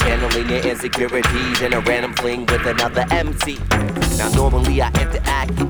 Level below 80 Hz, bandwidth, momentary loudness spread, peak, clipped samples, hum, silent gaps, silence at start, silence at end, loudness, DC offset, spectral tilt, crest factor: -24 dBFS; over 20 kHz; 3 LU; -2 dBFS; under 0.1%; none; none; 0 s; 0 s; -18 LUFS; under 0.1%; -4.5 dB/octave; 16 dB